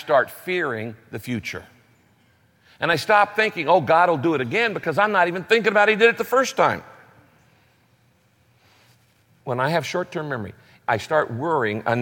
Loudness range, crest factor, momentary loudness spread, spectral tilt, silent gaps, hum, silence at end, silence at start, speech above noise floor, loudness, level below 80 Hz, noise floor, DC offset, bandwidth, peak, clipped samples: 11 LU; 18 dB; 14 LU; -5 dB/octave; none; none; 0 s; 0 s; 40 dB; -21 LUFS; -66 dBFS; -61 dBFS; under 0.1%; 17 kHz; -4 dBFS; under 0.1%